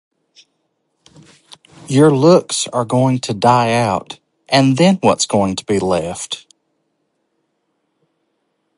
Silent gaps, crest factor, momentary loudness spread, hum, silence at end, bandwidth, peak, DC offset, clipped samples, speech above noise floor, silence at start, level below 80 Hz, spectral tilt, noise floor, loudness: none; 18 dB; 13 LU; none; 2.4 s; 11.5 kHz; 0 dBFS; under 0.1%; under 0.1%; 55 dB; 1.9 s; -52 dBFS; -5 dB/octave; -69 dBFS; -15 LUFS